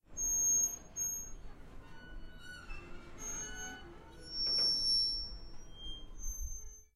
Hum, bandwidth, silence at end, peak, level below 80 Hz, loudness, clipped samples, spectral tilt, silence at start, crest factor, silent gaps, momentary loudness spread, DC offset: none; 14 kHz; 0.1 s; -24 dBFS; -50 dBFS; -33 LUFS; under 0.1%; 0.5 dB/octave; 0.1 s; 16 dB; none; 25 LU; under 0.1%